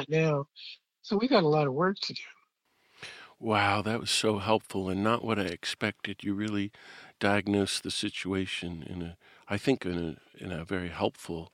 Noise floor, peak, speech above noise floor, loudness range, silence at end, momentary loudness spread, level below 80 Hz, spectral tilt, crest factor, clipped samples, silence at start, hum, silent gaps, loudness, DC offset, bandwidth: -71 dBFS; -8 dBFS; 41 dB; 4 LU; 0.05 s; 17 LU; -62 dBFS; -5 dB/octave; 22 dB; under 0.1%; 0 s; none; none; -30 LUFS; under 0.1%; 16 kHz